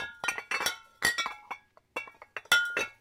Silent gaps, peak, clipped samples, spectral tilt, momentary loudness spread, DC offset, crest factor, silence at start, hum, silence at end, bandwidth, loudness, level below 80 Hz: none; -10 dBFS; under 0.1%; 0 dB/octave; 18 LU; under 0.1%; 24 dB; 0 s; none; 0.1 s; 16.5 kHz; -30 LUFS; -66 dBFS